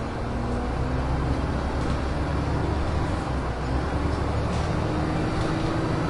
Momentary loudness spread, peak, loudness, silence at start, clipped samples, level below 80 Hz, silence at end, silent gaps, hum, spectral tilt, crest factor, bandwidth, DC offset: 2 LU; -12 dBFS; -27 LUFS; 0 s; under 0.1%; -30 dBFS; 0 s; none; none; -7 dB/octave; 14 dB; 11.5 kHz; under 0.1%